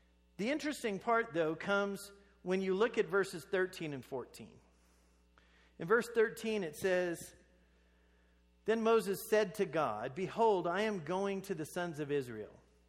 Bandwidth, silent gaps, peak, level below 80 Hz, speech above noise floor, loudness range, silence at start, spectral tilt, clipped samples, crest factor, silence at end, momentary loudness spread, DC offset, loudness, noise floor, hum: 16 kHz; none; -18 dBFS; -70 dBFS; 34 dB; 4 LU; 0.4 s; -5 dB/octave; under 0.1%; 18 dB; 0.35 s; 14 LU; under 0.1%; -35 LUFS; -69 dBFS; none